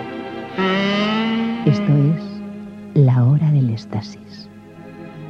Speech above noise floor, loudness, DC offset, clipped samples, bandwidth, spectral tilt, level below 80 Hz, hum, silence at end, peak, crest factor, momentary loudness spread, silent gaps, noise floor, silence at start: 22 dB; -18 LUFS; under 0.1%; under 0.1%; 6.6 kHz; -8 dB/octave; -58 dBFS; none; 0 s; -2 dBFS; 16 dB; 21 LU; none; -38 dBFS; 0 s